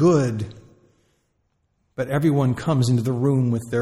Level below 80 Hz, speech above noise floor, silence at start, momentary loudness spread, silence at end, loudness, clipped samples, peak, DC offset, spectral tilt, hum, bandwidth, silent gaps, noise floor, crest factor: -56 dBFS; 50 dB; 0 s; 11 LU; 0 s; -21 LUFS; under 0.1%; -6 dBFS; under 0.1%; -7.5 dB/octave; none; 13 kHz; none; -69 dBFS; 16 dB